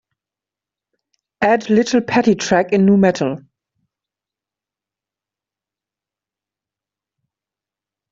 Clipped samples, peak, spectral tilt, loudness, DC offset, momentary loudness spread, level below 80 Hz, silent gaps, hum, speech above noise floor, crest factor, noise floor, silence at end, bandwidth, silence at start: under 0.1%; -2 dBFS; -6 dB/octave; -15 LUFS; under 0.1%; 9 LU; -58 dBFS; none; none; 74 dB; 18 dB; -88 dBFS; 4.7 s; 7.6 kHz; 1.4 s